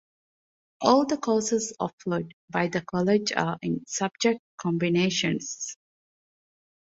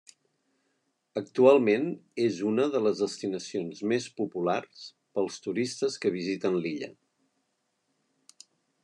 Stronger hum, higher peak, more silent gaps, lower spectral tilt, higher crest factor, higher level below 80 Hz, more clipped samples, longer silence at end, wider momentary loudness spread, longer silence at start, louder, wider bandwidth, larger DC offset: neither; first, -4 dBFS vs -8 dBFS; first, 1.93-1.98 s, 2.33-2.48 s, 4.39-4.58 s vs none; about the same, -4.5 dB/octave vs -5.5 dB/octave; about the same, 22 dB vs 20 dB; first, -66 dBFS vs -84 dBFS; neither; second, 1.1 s vs 1.9 s; second, 9 LU vs 13 LU; second, 0.8 s vs 1.15 s; about the same, -26 LUFS vs -28 LUFS; second, 8 kHz vs 10.5 kHz; neither